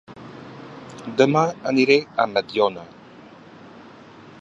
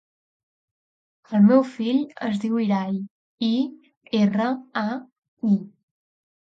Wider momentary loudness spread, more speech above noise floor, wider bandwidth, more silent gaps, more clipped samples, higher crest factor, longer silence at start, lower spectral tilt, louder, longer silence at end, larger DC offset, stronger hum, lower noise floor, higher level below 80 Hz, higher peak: first, 22 LU vs 12 LU; second, 25 dB vs over 69 dB; about the same, 7.8 kHz vs 7.4 kHz; second, none vs 3.11-3.38 s, 3.97-4.01 s, 5.12-5.22 s, 5.28-5.37 s; neither; about the same, 22 dB vs 18 dB; second, 0.1 s vs 1.3 s; second, -5.5 dB/octave vs -8 dB/octave; first, -20 LUFS vs -23 LUFS; first, 1.55 s vs 0.8 s; neither; neither; second, -45 dBFS vs under -90 dBFS; first, -66 dBFS vs -74 dBFS; first, -2 dBFS vs -6 dBFS